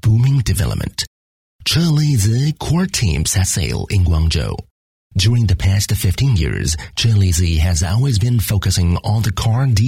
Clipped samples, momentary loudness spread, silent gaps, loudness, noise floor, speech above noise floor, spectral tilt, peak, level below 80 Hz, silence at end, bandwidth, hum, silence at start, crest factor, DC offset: under 0.1%; 6 LU; 1.07-1.59 s, 4.71-5.10 s; -16 LUFS; under -90 dBFS; over 75 dB; -5 dB/octave; -4 dBFS; -28 dBFS; 0 s; 16.5 kHz; none; 0.05 s; 12 dB; under 0.1%